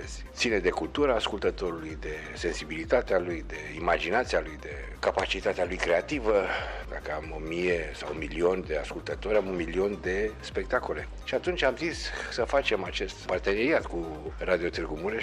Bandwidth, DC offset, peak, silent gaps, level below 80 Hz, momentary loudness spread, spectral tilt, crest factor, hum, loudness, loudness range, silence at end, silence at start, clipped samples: 12 kHz; under 0.1%; -12 dBFS; none; -42 dBFS; 9 LU; -4.5 dB/octave; 18 dB; none; -29 LUFS; 1 LU; 0 s; 0 s; under 0.1%